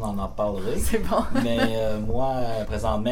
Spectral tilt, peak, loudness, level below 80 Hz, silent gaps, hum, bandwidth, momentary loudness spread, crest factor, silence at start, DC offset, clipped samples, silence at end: -5.5 dB/octave; -8 dBFS; -26 LUFS; -34 dBFS; none; none; 17 kHz; 4 LU; 14 dB; 0 s; under 0.1%; under 0.1%; 0 s